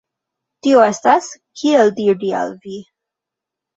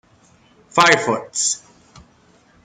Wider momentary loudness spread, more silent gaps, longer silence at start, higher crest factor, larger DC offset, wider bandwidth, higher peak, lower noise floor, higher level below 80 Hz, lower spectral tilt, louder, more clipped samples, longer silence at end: first, 19 LU vs 9 LU; neither; about the same, 0.65 s vs 0.75 s; about the same, 18 dB vs 20 dB; neither; second, 8 kHz vs 11.5 kHz; about the same, 0 dBFS vs -2 dBFS; first, -84 dBFS vs -54 dBFS; about the same, -66 dBFS vs -62 dBFS; first, -4.5 dB/octave vs -1.5 dB/octave; about the same, -15 LUFS vs -17 LUFS; neither; second, 0.95 s vs 1.1 s